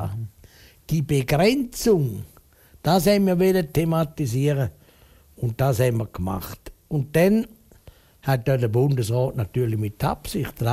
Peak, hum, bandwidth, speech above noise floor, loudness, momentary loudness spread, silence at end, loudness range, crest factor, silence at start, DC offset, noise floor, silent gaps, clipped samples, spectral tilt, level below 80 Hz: -6 dBFS; none; 16 kHz; 32 dB; -23 LUFS; 12 LU; 0 s; 3 LU; 18 dB; 0 s; under 0.1%; -53 dBFS; none; under 0.1%; -6.5 dB/octave; -46 dBFS